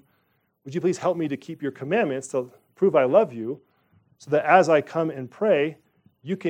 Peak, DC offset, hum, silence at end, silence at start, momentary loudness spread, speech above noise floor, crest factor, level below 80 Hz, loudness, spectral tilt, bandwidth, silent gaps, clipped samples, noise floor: -4 dBFS; under 0.1%; none; 0 s; 0.65 s; 15 LU; 47 dB; 20 dB; -76 dBFS; -23 LUFS; -6 dB/octave; 10.5 kHz; none; under 0.1%; -69 dBFS